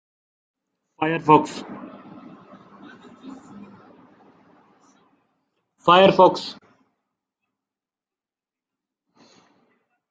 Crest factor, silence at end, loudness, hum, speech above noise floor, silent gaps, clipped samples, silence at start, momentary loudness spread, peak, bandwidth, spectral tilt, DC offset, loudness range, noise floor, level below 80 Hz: 24 dB; 3.6 s; -18 LUFS; none; over 73 dB; none; under 0.1%; 1 s; 28 LU; -2 dBFS; 9 kHz; -6 dB/octave; under 0.1%; 17 LU; under -90 dBFS; -66 dBFS